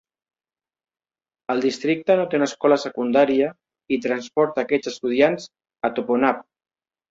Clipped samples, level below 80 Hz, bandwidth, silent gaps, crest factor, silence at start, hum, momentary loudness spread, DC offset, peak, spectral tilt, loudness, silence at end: under 0.1%; -68 dBFS; 7.8 kHz; none; 18 dB; 1.5 s; none; 8 LU; under 0.1%; -4 dBFS; -5 dB/octave; -21 LUFS; 0.7 s